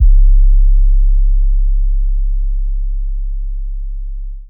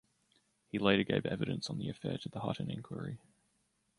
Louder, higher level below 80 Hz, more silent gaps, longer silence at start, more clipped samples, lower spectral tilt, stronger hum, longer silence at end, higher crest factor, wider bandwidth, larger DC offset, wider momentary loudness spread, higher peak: first, -18 LUFS vs -36 LUFS; first, -10 dBFS vs -64 dBFS; neither; second, 0 s vs 0.75 s; neither; first, -15 dB/octave vs -6 dB/octave; neither; second, 0.05 s vs 0.8 s; second, 8 dB vs 24 dB; second, 0.2 kHz vs 11.5 kHz; neither; about the same, 13 LU vs 13 LU; first, -2 dBFS vs -12 dBFS